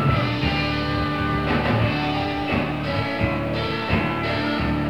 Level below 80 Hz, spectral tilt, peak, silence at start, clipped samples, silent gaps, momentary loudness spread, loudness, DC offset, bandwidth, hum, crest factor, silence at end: -36 dBFS; -7 dB/octave; -8 dBFS; 0 s; under 0.1%; none; 3 LU; -23 LUFS; 0.5%; 15 kHz; none; 14 dB; 0 s